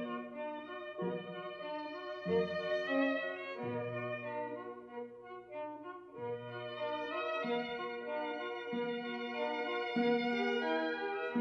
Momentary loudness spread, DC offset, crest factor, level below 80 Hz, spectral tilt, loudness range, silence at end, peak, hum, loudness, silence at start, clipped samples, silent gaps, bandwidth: 12 LU; under 0.1%; 18 dB; -82 dBFS; -6.5 dB/octave; 7 LU; 0 s; -22 dBFS; 60 Hz at -65 dBFS; -38 LUFS; 0 s; under 0.1%; none; 6.8 kHz